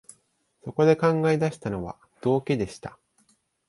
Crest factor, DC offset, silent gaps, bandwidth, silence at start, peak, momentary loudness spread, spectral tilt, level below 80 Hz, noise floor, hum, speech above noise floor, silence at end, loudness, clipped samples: 20 dB; under 0.1%; none; 11.5 kHz; 0.65 s; -6 dBFS; 19 LU; -7 dB/octave; -56 dBFS; -68 dBFS; none; 44 dB; 0.8 s; -25 LUFS; under 0.1%